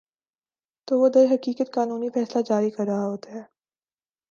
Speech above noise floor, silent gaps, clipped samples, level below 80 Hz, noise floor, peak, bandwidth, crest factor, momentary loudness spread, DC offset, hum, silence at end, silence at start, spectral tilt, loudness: over 68 dB; none; under 0.1%; -78 dBFS; under -90 dBFS; -6 dBFS; 7.2 kHz; 18 dB; 14 LU; under 0.1%; none; 0.85 s; 0.9 s; -7 dB/octave; -23 LUFS